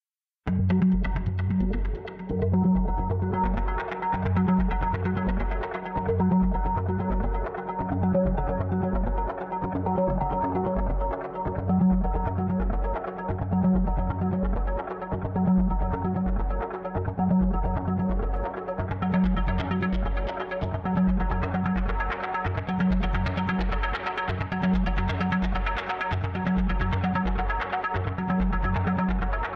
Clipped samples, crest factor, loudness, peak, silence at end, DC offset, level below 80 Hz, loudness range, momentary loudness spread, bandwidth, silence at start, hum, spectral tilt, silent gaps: under 0.1%; 12 dB; -27 LUFS; -12 dBFS; 0 s; under 0.1%; -30 dBFS; 2 LU; 7 LU; 5.6 kHz; 0.45 s; none; -9.5 dB/octave; none